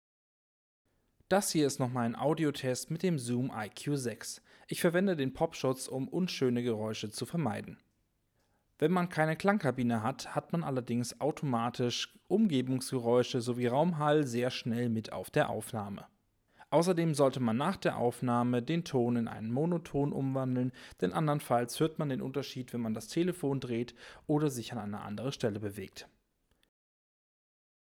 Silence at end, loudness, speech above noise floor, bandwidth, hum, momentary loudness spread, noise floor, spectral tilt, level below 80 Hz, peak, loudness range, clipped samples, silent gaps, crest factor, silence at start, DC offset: 1.9 s; -33 LUFS; 44 dB; 18.5 kHz; none; 9 LU; -76 dBFS; -6 dB/octave; -68 dBFS; -12 dBFS; 4 LU; under 0.1%; none; 20 dB; 1.3 s; under 0.1%